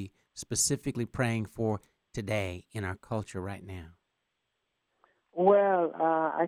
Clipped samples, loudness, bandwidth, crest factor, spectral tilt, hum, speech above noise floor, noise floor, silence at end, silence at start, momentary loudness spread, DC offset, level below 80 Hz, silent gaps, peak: under 0.1%; -30 LUFS; 16 kHz; 20 dB; -4.5 dB/octave; none; 52 dB; -81 dBFS; 0 s; 0 s; 19 LU; under 0.1%; -60 dBFS; none; -12 dBFS